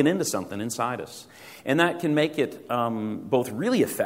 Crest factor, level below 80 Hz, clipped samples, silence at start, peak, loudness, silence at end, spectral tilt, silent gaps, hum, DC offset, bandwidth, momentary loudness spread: 20 dB; -68 dBFS; under 0.1%; 0 s; -6 dBFS; -26 LUFS; 0 s; -5 dB/octave; none; none; under 0.1%; 16 kHz; 13 LU